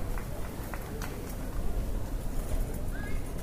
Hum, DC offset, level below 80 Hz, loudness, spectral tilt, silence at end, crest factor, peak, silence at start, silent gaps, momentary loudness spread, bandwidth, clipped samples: none; under 0.1%; -34 dBFS; -38 LUFS; -6 dB/octave; 0 s; 14 dB; -18 dBFS; 0 s; none; 3 LU; 15.5 kHz; under 0.1%